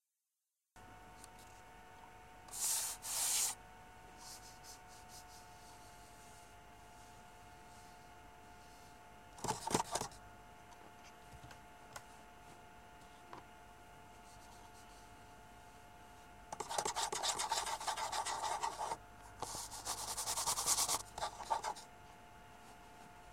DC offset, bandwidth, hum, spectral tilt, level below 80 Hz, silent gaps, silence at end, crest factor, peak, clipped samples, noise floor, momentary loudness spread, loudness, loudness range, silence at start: under 0.1%; 16.5 kHz; none; -1 dB/octave; -66 dBFS; none; 0 s; 26 dB; -18 dBFS; under 0.1%; under -90 dBFS; 22 LU; -39 LUFS; 19 LU; 0.75 s